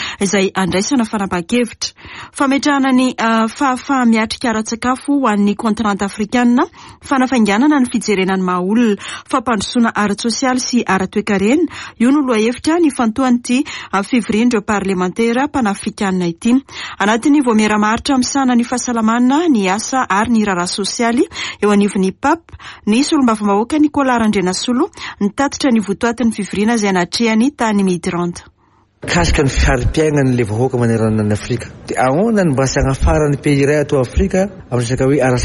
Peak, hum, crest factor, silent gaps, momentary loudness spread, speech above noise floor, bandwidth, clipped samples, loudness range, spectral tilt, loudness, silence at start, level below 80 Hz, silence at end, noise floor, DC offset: -4 dBFS; none; 12 dB; none; 6 LU; 40 dB; 11.5 kHz; under 0.1%; 2 LU; -5 dB/octave; -15 LUFS; 0 s; -30 dBFS; 0 s; -54 dBFS; under 0.1%